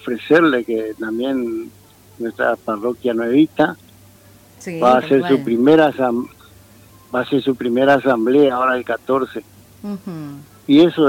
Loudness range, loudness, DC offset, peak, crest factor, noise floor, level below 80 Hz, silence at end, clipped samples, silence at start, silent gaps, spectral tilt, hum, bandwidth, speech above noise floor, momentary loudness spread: 4 LU; -17 LUFS; under 0.1%; -4 dBFS; 14 dB; -46 dBFS; -58 dBFS; 0 s; under 0.1%; 0.05 s; none; -6.5 dB/octave; none; 16.5 kHz; 30 dB; 17 LU